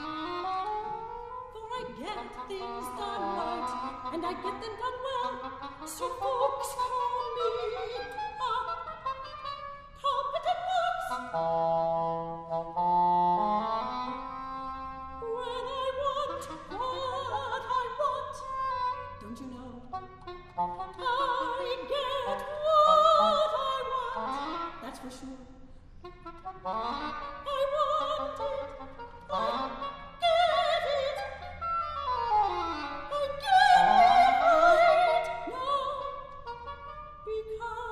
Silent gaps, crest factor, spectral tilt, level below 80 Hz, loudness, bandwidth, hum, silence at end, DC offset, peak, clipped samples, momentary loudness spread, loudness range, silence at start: none; 20 dB; -4 dB/octave; -54 dBFS; -29 LUFS; 13 kHz; none; 0 s; under 0.1%; -10 dBFS; under 0.1%; 19 LU; 12 LU; 0 s